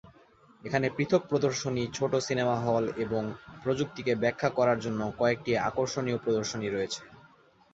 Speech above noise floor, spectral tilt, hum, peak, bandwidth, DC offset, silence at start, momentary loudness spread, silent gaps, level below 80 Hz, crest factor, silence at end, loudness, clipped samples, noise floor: 31 dB; -5.5 dB/octave; none; -10 dBFS; 8 kHz; under 0.1%; 0.05 s; 6 LU; none; -62 dBFS; 20 dB; 0.55 s; -29 LUFS; under 0.1%; -60 dBFS